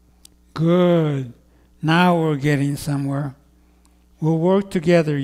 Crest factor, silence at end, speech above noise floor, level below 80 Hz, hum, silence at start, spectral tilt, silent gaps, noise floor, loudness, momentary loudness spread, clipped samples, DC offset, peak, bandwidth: 16 dB; 0 s; 36 dB; -52 dBFS; none; 0.55 s; -7 dB/octave; none; -54 dBFS; -19 LUFS; 11 LU; under 0.1%; under 0.1%; -4 dBFS; 15.5 kHz